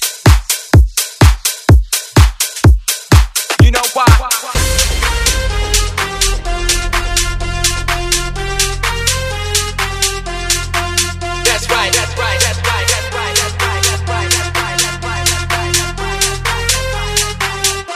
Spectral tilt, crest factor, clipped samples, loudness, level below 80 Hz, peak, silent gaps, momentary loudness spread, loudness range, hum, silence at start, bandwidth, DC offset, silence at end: -3 dB/octave; 14 dB; 0.4%; -13 LUFS; -18 dBFS; 0 dBFS; none; 5 LU; 4 LU; none; 0 s; 16 kHz; under 0.1%; 0 s